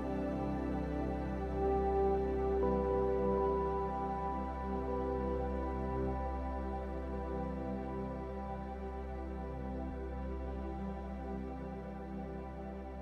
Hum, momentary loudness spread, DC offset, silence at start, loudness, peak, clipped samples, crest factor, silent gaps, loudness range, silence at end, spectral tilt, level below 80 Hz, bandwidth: none; 10 LU; under 0.1%; 0 s; -38 LUFS; -22 dBFS; under 0.1%; 14 dB; none; 8 LU; 0 s; -9.5 dB/octave; -44 dBFS; 6.2 kHz